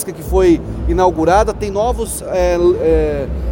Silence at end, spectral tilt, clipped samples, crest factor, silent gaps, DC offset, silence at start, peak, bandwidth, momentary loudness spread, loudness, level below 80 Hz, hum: 0 s; -6.5 dB/octave; under 0.1%; 14 dB; none; under 0.1%; 0 s; 0 dBFS; 17 kHz; 7 LU; -15 LUFS; -24 dBFS; none